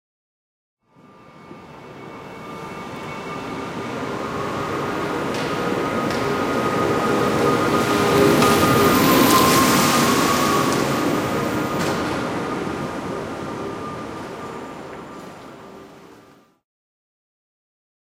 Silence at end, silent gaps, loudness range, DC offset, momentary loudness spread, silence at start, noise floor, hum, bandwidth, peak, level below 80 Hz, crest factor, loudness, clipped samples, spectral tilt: 1.9 s; none; 19 LU; under 0.1%; 21 LU; 1.35 s; -50 dBFS; none; 16.5 kHz; -4 dBFS; -50 dBFS; 18 dB; -19 LUFS; under 0.1%; -4.5 dB/octave